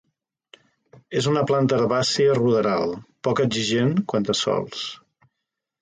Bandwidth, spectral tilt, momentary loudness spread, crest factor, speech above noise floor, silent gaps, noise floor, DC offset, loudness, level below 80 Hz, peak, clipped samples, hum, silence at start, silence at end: 9.6 kHz; -5 dB/octave; 10 LU; 14 dB; 61 dB; none; -82 dBFS; under 0.1%; -22 LUFS; -60 dBFS; -8 dBFS; under 0.1%; none; 1.1 s; 0.85 s